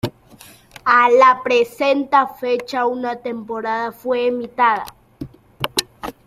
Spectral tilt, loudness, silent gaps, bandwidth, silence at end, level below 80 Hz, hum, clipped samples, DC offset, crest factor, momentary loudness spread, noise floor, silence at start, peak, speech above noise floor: -3.5 dB/octave; -18 LUFS; none; 15.5 kHz; 0.15 s; -56 dBFS; none; under 0.1%; under 0.1%; 18 dB; 19 LU; -45 dBFS; 0.05 s; 0 dBFS; 28 dB